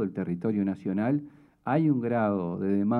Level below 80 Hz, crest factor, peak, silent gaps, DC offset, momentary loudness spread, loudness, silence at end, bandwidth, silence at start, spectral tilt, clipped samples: -72 dBFS; 14 dB; -12 dBFS; none; under 0.1%; 6 LU; -28 LUFS; 0 s; 4.4 kHz; 0 s; -11 dB/octave; under 0.1%